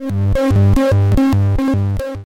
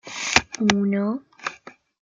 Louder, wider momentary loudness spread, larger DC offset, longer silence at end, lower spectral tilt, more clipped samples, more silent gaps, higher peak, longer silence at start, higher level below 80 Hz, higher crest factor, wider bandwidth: first, -15 LUFS vs -22 LUFS; second, 5 LU vs 14 LU; neither; second, 0.05 s vs 0.4 s; first, -8.5 dB/octave vs -3.5 dB/octave; neither; neither; second, -6 dBFS vs 0 dBFS; about the same, 0 s vs 0.05 s; first, -24 dBFS vs -52 dBFS; second, 6 dB vs 24 dB; first, 10.5 kHz vs 9.2 kHz